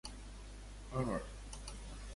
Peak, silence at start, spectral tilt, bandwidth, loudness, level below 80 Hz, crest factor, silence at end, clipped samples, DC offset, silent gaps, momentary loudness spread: -24 dBFS; 0.05 s; -5.5 dB/octave; 11.5 kHz; -45 LUFS; -50 dBFS; 20 dB; 0 s; under 0.1%; under 0.1%; none; 14 LU